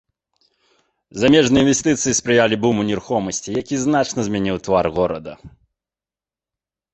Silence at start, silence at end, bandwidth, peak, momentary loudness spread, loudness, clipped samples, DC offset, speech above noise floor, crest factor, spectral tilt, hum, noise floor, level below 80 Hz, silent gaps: 1.15 s; 1.45 s; 8.4 kHz; 0 dBFS; 9 LU; -18 LUFS; under 0.1%; under 0.1%; over 72 dB; 20 dB; -4 dB/octave; none; under -90 dBFS; -48 dBFS; none